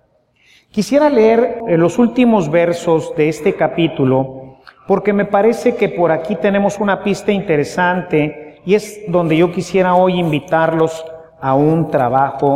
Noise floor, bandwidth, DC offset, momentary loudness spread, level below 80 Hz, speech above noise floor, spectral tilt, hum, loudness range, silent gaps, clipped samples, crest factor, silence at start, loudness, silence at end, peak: -55 dBFS; 15 kHz; under 0.1%; 6 LU; -52 dBFS; 41 dB; -6.5 dB/octave; none; 2 LU; none; under 0.1%; 14 dB; 0.75 s; -15 LUFS; 0 s; 0 dBFS